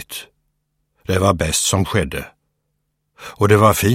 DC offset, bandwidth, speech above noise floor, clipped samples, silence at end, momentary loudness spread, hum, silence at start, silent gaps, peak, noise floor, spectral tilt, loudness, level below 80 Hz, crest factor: under 0.1%; 16.5 kHz; 56 dB; under 0.1%; 0 s; 24 LU; none; 0 s; none; 0 dBFS; -71 dBFS; -4.5 dB/octave; -16 LUFS; -40 dBFS; 18 dB